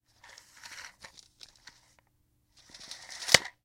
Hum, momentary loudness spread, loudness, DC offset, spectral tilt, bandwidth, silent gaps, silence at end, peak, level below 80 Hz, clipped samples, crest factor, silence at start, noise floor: none; 29 LU; -26 LUFS; under 0.1%; -0.5 dB/octave; 16.5 kHz; none; 0.15 s; 0 dBFS; -64 dBFS; under 0.1%; 36 dB; 0.7 s; -72 dBFS